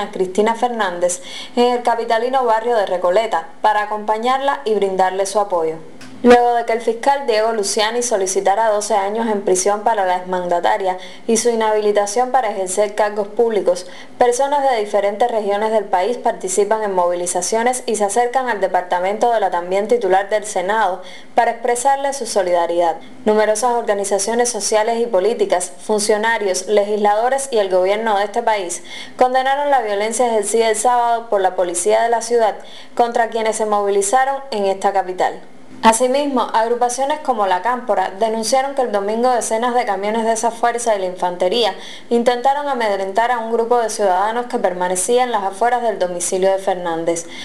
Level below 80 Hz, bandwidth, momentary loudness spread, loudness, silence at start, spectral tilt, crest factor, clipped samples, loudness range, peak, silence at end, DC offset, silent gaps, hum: -58 dBFS; 13.5 kHz; 4 LU; -17 LUFS; 0 s; -2.5 dB/octave; 14 dB; under 0.1%; 1 LU; -4 dBFS; 0 s; 2%; none; none